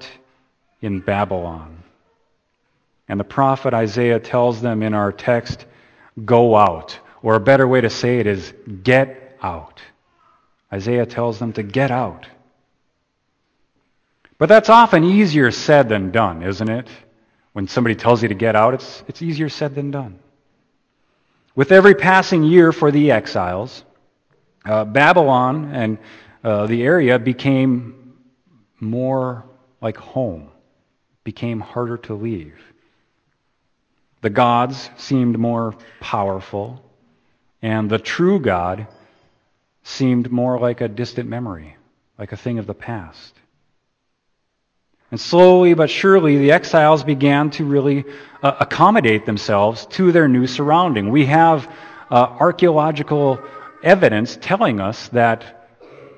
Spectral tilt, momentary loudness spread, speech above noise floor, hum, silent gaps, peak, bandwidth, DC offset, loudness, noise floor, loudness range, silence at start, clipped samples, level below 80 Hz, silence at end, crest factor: -7 dB/octave; 17 LU; 54 dB; none; none; 0 dBFS; 8.6 kHz; under 0.1%; -16 LUFS; -70 dBFS; 12 LU; 0 s; under 0.1%; -54 dBFS; 0.7 s; 18 dB